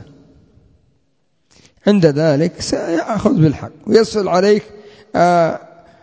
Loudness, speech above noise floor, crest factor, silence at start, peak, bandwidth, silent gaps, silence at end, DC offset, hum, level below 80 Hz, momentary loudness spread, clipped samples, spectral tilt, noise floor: -15 LUFS; 51 dB; 16 dB; 0 s; 0 dBFS; 8 kHz; none; 0.45 s; under 0.1%; none; -46 dBFS; 7 LU; under 0.1%; -6.5 dB/octave; -66 dBFS